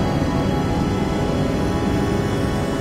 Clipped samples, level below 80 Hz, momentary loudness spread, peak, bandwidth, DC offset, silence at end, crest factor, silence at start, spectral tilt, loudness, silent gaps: under 0.1%; -30 dBFS; 1 LU; -8 dBFS; 16 kHz; under 0.1%; 0 s; 12 dB; 0 s; -6.5 dB/octave; -21 LUFS; none